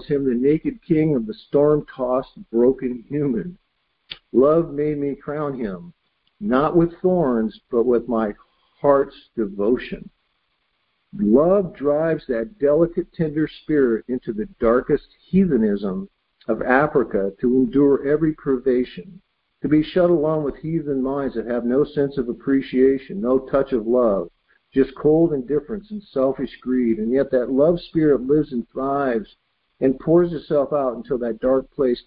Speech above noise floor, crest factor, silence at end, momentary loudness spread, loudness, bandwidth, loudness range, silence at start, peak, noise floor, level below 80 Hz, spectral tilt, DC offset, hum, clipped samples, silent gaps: 50 dB; 18 dB; 0.05 s; 10 LU; -21 LUFS; 5 kHz; 2 LU; 0 s; -2 dBFS; -70 dBFS; -48 dBFS; -12.5 dB/octave; under 0.1%; none; under 0.1%; none